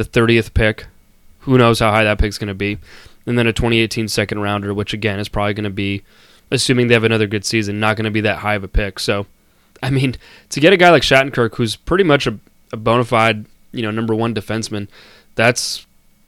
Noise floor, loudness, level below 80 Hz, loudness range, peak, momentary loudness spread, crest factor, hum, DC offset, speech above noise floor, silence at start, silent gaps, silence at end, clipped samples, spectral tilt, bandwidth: -47 dBFS; -16 LUFS; -32 dBFS; 5 LU; 0 dBFS; 14 LU; 16 dB; none; under 0.1%; 31 dB; 0 s; none; 0.45 s; under 0.1%; -5 dB/octave; 16 kHz